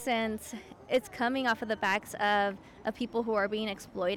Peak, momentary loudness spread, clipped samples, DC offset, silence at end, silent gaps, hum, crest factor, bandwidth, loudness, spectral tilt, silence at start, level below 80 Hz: -18 dBFS; 10 LU; under 0.1%; under 0.1%; 0 s; none; none; 12 dB; 18.5 kHz; -31 LUFS; -4 dB/octave; 0 s; -62 dBFS